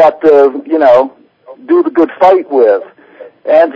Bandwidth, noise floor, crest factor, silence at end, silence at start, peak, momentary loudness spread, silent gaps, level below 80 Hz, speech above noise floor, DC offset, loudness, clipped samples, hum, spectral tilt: 8 kHz; -36 dBFS; 10 dB; 0.05 s; 0 s; 0 dBFS; 7 LU; none; -56 dBFS; 28 dB; under 0.1%; -9 LUFS; 2%; none; -6.5 dB/octave